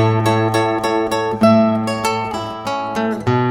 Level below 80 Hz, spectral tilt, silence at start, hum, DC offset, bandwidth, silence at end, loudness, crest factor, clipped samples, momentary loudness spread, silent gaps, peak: -48 dBFS; -6.5 dB/octave; 0 s; none; under 0.1%; 17 kHz; 0 s; -17 LUFS; 16 dB; under 0.1%; 9 LU; none; -2 dBFS